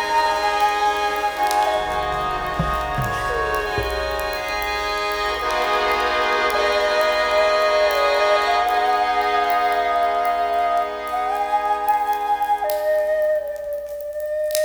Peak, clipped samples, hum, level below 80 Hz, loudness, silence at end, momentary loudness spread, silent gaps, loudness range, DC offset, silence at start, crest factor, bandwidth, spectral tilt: -2 dBFS; under 0.1%; none; -40 dBFS; -20 LUFS; 0 s; 6 LU; none; 4 LU; under 0.1%; 0 s; 18 dB; over 20 kHz; -3 dB/octave